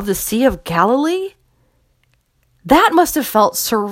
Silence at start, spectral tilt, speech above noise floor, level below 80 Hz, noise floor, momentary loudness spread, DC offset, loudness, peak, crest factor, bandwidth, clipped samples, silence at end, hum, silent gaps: 0 s; -4 dB/octave; 46 dB; -42 dBFS; -61 dBFS; 8 LU; under 0.1%; -15 LUFS; 0 dBFS; 16 dB; 16.5 kHz; under 0.1%; 0 s; none; none